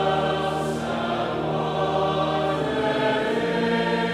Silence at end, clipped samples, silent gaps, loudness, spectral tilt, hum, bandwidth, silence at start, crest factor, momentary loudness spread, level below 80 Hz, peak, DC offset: 0 s; under 0.1%; none; -24 LUFS; -6 dB/octave; none; 14 kHz; 0 s; 12 dB; 3 LU; -50 dBFS; -10 dBFS; under 0.1%